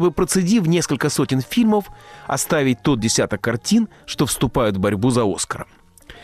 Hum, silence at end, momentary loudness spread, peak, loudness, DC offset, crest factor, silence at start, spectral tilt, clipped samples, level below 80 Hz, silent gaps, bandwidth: none; 0 s; 9 LU; -8 dBFS; -19 LUFS; under 0.1%; 12 dB; 0 s; -5 dB/octave; under 0.1%; -42 dBFS; none; 15 kHz